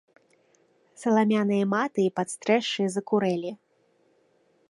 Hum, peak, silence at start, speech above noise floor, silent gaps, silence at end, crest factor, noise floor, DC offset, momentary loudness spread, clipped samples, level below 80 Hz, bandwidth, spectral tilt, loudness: none; -8 dBFS; 1 s; 42 dB; none; 1.15 s; 18 dB; -66 dBFS; under 0.1%; 9 LU; under 0.1%; -76 dBFS; 11.5 kHz; -5.5 dB/octave; -25 LUFS